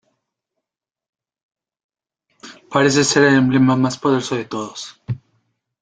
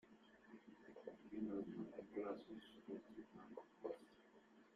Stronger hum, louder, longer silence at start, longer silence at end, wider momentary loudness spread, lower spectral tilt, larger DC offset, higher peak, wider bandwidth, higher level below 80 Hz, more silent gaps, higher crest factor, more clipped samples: neither; first, -16 LUFS vs -54 LUFS; first, 2.45 s vs 0.05 s; first, 0.65 s vs 0 s; about the same, 17 LU vs 19 LU; second, -4.5 dB/octave vs -7.5 dB/octave; neither; first, -2 dBFS vs -34 dBFS; second, 9.4 kHz vs 11.5 kHz; first, -56 dBFS vs -84 dBFS; neither; about the same, 18 dB vs 20 dB; neither